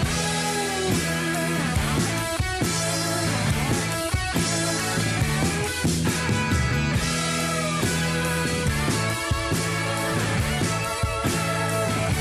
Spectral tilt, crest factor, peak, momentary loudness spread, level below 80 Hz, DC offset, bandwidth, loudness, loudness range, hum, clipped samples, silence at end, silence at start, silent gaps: -4 dB/octave; 12 dB; -12 dBFS; 2 LU; -36 dBFS; under 0.1%; 13.5 kHz; -24 LUFS; 1 LU; none; under 0.1%; 0 s; 0 s; none